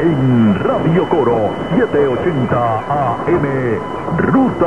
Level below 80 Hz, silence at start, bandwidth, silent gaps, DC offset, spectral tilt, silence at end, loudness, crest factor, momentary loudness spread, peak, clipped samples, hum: -40 dBFS; 0 s; 10 kHz; none; 1%; -9 dB/octave; 0 s; -15 LUFS; 14 dB; 5 LU; 0 dBFS; under 0.1%; none